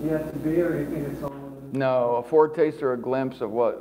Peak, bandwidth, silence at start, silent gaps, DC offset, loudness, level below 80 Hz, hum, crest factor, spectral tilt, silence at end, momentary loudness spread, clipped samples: -6 dBFS; 16 kHz; 0 s; none; under 0.1%; -25 LUFS; -54 dBFS; none; 18 dB; -8 dB/octave; 0 s; 12 LU; under 0.1%